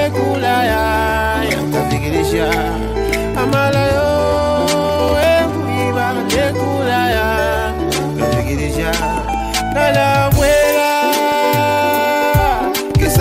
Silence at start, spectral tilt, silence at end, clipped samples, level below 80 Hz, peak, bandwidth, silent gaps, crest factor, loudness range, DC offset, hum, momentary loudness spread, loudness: 0 s; -5 dB/octave; 0 s; under 0.1%; -26 dBFS; -2 dBFS; 16 kHz; none; 14 dB; 3 LU; under 0.1%; none; 5 LU; -15 LUFS